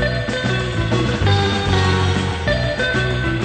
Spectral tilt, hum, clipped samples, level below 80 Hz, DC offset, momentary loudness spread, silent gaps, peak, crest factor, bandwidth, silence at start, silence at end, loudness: -5.5 dB/octave; none; under 0.1%; -30 dBFS; under 0.1%; 4 LU; none; -4 dBFS; 14 dB; 9.2 kHz; 0 s; 0 s; -18 LUFS